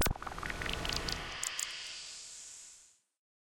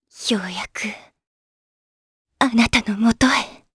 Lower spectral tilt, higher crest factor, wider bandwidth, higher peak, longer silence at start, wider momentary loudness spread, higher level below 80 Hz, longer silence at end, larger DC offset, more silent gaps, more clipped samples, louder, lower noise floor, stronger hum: second, -2 dB/octave vs -3.5 dB/octave; about the same, 22 dB vs 20 dB; first, 16.5 kHz vs 11 kHz; second, -18 dBFS vs -2 dBFS; second, 0 s vs 0.15 s; about the same, 13 LU vs 12 LU; about the same, -48 dBFS vs -44 dBFS; first, 0.6 s vs 0.2 s; neither; second, none vs 1.27-2.25 s; neither; second, -38 LUFS vs -20 LUFS; second, -62 dBFS vs under -90 dBFS; neither